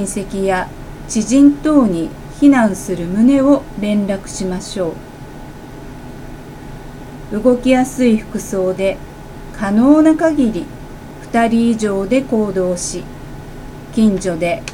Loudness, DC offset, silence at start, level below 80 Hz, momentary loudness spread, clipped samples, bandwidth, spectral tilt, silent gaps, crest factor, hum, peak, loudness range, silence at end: -15 LUFS; under 0.1%; 0 s; -36 dBFS; 22 LU; under 0.1%; 15.5 kHz; -5.5 dB/octave; none; 16 dB; none; 0 dBFS; 8 LU; 0 s